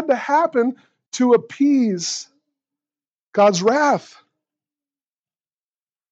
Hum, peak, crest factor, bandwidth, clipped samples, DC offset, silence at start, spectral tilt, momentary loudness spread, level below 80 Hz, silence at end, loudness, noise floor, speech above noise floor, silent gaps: none; -4 dBFS; 18 dB; 8.2 kHz; under 0.1%; under 0.1%; 0 s; -4.5 dB/octave; 10 LU; -84 dBFS; 2.1 s; -18 LUFS; under -90 dBFS; over 73 dB; 1.06-1.12 s, 3.20-3.32 s